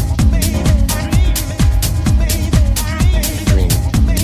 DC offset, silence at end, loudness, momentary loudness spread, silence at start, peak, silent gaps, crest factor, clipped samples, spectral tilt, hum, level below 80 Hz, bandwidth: under 0.1%; 0 s; -15 LUFS; 2 LU; 0 s; 0 dBFS; none; 12 dB; under 0.1%; -5 dB/octave; none; -14 dBFS; 16 kHz